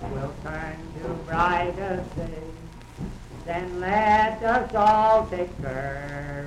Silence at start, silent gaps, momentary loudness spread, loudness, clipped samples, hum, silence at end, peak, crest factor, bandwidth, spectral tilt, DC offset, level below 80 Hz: 0 s; none; 18 LU; -24 LUFS; under 0.1%; none; 0 s; -8 dBFS; 16 dB; 11.5 kHz; -6.5 dB/octave; under 0.1%; -42 dBFS